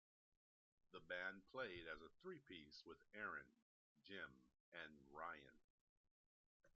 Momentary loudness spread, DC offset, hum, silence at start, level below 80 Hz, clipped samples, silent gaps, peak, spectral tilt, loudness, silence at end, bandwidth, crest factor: 11 LU; under 0.1%; none; 0.9 s; -84 dBFS; under 0.1%; 3.62-3.96 s, 4.60-4.72 s, 5.64-6.04 s, 6.11-6.60 s; -38 dBFS; -1.5 dB/octave; -56 LUFS; 0.05 s; 7 kHz; 22 dB